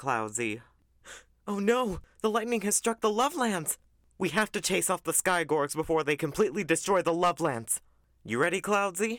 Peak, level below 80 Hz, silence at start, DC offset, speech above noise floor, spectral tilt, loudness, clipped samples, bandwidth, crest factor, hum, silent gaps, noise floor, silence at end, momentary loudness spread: -14 dBFS; -58 dBFS; 0 s; under 0.1%; 23 dB; -3.5 dB/octave; -28 LUFS; under 0.1%; 19 kHz; 16 dB; none; none; -52 dBFS; 0 s; 8 LU